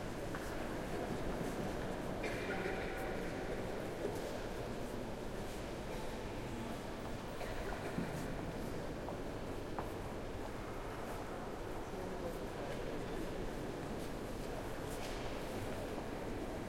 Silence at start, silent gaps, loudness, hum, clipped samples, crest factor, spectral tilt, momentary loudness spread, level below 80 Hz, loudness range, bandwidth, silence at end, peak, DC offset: 0 s; none; -43 LUFS; none; under 0.1%; 16 dB; -5.5 dB/octave; 4 LU; -50 dBFS; 3 LU; 16.5 kHz; 0 s; -26 dBFS; under 0.1%